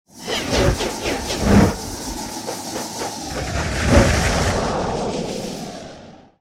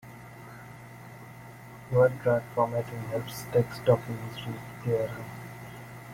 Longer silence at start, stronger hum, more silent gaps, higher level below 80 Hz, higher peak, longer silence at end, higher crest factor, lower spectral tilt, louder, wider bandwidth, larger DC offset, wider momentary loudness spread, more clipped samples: about the same, 0.15 s vs 0.05 s; neither; neither; first, -30 dBFS vs -60 dBFS; first, 0 dBFS vs -10 dBFS; first, 0.25 s vs 0 s; about the same, 20 dB vs 20 dB; second, -4.5 dB/octave vs -7 dB/octave; first, -20 LUFS vs -29 LUFS; about the same, 16.5 kHz vs 16.5 kHz; neither; second, 13 LU vs 22 LU; neither